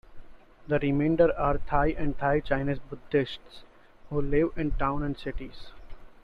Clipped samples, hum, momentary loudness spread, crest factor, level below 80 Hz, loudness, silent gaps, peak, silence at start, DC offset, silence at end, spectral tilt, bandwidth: under 0.1%; none; 13 LU; 18 dB; -38 dBFS; -28 LUFS; none; -8 dBFS; 0.1 s; under 0.1%; 0.1 s; -9 dB/octave; 5.2 kHz